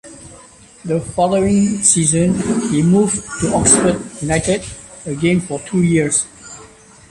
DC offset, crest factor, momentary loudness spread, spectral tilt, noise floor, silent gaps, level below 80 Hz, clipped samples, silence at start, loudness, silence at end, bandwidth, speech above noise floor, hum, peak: under 0.1%; 16 dB; 17 LU; -4.5 dB/octave; -42 dBFS; none; -40 dBFS; under 0.1%; 0.05 s; -15 LUFS; 0.45 s; 16 kHz; 27 dB; none; 0 dBFS